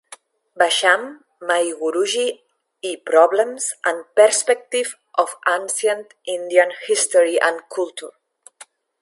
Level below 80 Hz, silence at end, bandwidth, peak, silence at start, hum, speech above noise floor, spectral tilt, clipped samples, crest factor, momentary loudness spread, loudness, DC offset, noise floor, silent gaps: -80 dBFS; 0.4 s; 11.5 kHz; 0 dBFS; 0.1 s; none; 29 dB; 0 dB/octave; under 0.1%; 20 dB; 14 LU; -19 LUFS; under 0.1%; -48 dBFS; none